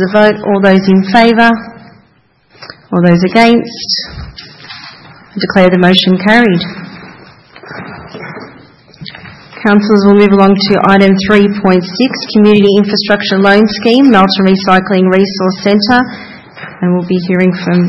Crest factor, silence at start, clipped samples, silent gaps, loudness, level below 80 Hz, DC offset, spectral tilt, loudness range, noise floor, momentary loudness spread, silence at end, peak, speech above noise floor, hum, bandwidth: 10 dB; 0 s; 1%; none; -8 LUFS; -42 dBFS; under 0.1%; -7 dB/octave; 5 LU; -50 dBFS; 21 LU; 0 s; 0 dBFS; 42 dB; none; 7.8 kHz